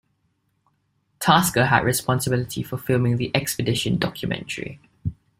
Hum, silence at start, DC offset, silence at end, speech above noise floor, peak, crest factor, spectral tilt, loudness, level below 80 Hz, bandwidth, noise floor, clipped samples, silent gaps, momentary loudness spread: none; 1.2 s; under 0.1%; 0.25 s; 48 dB; -2 dBFS; 22 dB; -4.5 dB/octave; -22 LUFS; -50 dBFS; 16 kHz; -70 dBFS; under 0.1%; none; 14 LU